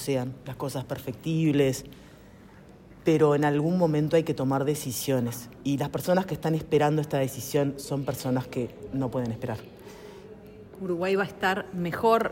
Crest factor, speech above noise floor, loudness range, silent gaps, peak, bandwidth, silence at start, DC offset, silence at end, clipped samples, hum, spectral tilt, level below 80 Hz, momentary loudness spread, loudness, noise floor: 18 dB; 24 dB; 6 LU; none; -10 dBFS; 16.5 kHz; 0 s; under 0.1%; 0 s; under 0.1%; none; -6 dB/octave; -56 dBFS; 15 LU; -27 LUFS; -50 dBFS